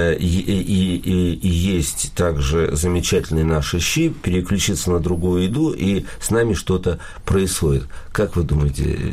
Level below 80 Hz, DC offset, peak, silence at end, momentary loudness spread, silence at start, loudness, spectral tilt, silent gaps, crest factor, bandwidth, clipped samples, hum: -28 dBFS; under 0.1%; -8 dBFS; 0 s; 3 LU; 0 s; -20 LUFS; -5.5 dB/octave; none; 12 dB; 15.5 kHz; under 0.1%; none